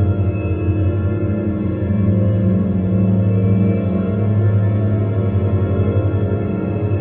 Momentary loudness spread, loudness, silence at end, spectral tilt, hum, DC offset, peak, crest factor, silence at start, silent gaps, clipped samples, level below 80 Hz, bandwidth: 4 LU; -17 LUFS; 0 s; -11 dB/octave; none; under 0.1%; -4 dBFS; 12 dB; 0 s; none; under 0.1%; -36 dBFS; 3.6 kHz